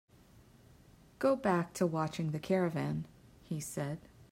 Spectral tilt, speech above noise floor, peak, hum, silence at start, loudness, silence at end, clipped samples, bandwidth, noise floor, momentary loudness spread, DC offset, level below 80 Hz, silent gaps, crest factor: -6.5 dB/octave; 27 dB; -18 dBFS; none; 1.2 s; -35 LUFS; 0.1 s; under 0.1%; 16 kHz; -61 dBFS; 10 LU; under 0.1%; -66 dBFS; none; 18 dB